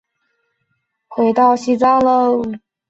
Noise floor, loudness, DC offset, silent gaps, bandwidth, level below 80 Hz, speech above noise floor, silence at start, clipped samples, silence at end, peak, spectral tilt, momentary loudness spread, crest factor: -70 dBFS; -14 LUFS; under 0.1%; none; 8 kHz; -56 dBFS; 56 dB; 1.1 s; under 0.1%; 0.35 s; -2 dBFS; -6 dB/octave; 10 LU; 14 dB